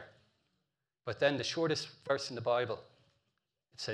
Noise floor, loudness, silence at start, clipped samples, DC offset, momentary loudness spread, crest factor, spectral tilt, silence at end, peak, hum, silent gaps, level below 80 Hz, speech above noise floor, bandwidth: -86 dBFS; -35 LUFS; 0 s; under 0.1%; under 0.1%; 12 LU; 22 dB; -4 dB/octave; 0 s; -14 dBFS; none; none; -78 dBFS; 51 dB; 11.5 kHz